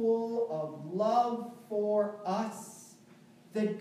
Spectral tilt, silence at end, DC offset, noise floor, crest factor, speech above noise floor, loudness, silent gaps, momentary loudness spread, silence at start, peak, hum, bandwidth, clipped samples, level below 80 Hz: -6.5 dB/octave; 0 s; under 0.1%; -58 dBFS; 16 dB; 26 dB; -33 LUFS; none; 11 LU; 0 s; -16 dBFS; none; 15 kHz; under 0.1%; under -90 dBFS